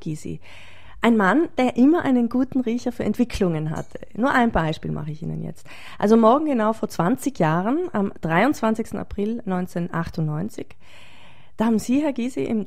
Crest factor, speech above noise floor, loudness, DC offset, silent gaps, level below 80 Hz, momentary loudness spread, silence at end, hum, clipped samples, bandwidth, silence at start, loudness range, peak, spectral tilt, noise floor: 20 dB; 29 dB; -22 LUFS; 1%; none; -46 dBFS; 15 LU; 0 s; none; under 0.1%; 15 kHz; 0.05 s; 5 LU; -2 dBFS; -7 dB/octave; -50 dBFS